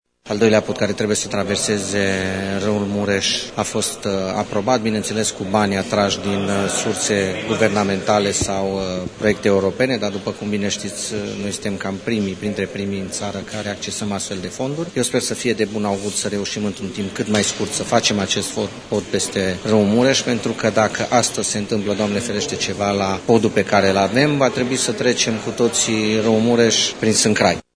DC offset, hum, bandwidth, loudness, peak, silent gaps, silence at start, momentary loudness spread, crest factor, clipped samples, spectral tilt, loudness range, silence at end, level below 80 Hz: under 0.1%; none; 11 kHz; -19 LUFS; 0 dBFS; none; 0.25 s; 9 LU; 20 dB; under 0.1%; -3.5 dB/octave; 6 LU; 0.15 s; -50 dBFS